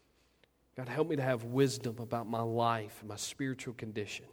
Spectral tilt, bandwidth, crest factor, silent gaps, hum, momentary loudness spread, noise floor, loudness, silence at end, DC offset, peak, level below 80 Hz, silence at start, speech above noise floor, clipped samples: -5.5 dB/octave; over 20 kHz; 20 dB; none; none; 10 LU; -70 dBFS; -35 LUFS; 0.05 s; under 0.1%; -16 dBFS; -72 dBFS; 0.75 s; 35 dB; under 0.1%